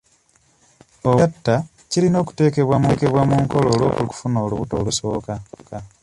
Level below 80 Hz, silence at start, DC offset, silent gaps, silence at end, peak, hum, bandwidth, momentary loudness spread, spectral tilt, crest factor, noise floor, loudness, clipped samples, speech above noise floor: -44 dBFS; 1.05 s; under 0.1%; none; 0.15 s; -2 dBFS; none; 11.5 kHz; 10 LU; -6.5 dB/octave; 16 dB; -59 dBFS; -19 LUFS; under 0.1%; 40 dB